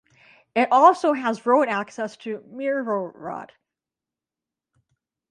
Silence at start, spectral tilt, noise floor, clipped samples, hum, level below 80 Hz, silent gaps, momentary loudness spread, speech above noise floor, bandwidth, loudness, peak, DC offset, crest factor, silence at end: 0.55 s; -5 dB/octave; -89 dBFS; under 0.1%; none; -76 dBFS; none; 18 LU; 67 dB; 10.5 kHz; -21 LUFS; -4 dBFS; under 0.1%; 20 dB; 1.85 s